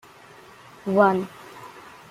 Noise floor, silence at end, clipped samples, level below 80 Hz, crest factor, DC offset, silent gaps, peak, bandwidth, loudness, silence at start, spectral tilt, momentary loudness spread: -48 dBFS; 0.3 s; under 0.1%; -68 dBFS; 22 dB; under 0.1%; none; -4 dBFS; 15.5 kHz; -21 LUFS; 0.85 s; -7.5 dB/octave; 24 LU